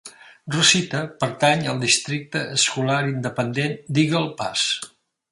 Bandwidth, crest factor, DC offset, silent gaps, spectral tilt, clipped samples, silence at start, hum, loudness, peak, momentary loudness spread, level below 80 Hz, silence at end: 11.5 kHz; 20 dB; under 0.1%; none; -3 dB/octave; under 0.1%; 0.05 s; none; -21 LUFS; -2 dBFS; 10 LU; -62 dBFS; 0.45 s